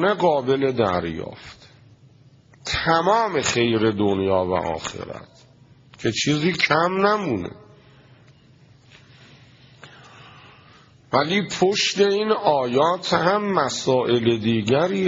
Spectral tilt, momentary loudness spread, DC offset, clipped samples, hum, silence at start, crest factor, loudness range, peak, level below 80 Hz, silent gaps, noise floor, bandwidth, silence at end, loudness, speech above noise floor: -3.5 dB/octave; 12 LU; under 0.1%; under 0.1%; none; 0 s; 20 dB; 7 LU; -2 dBFS; -56 dBFS; none; -52 dBFS; 7.8 kHz; 0 s; -21 LUFS; 32 dB